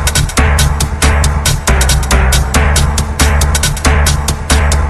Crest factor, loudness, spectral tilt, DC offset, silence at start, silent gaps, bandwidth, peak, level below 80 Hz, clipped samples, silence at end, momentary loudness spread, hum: 10 dB; -11 LUFS; -3.5 dB/octave; under 0.1%; 0 s; none; 14.5 kHz; 0 dBFS; -12 dBFS; under 0.1%; 0 s; 2 LU; none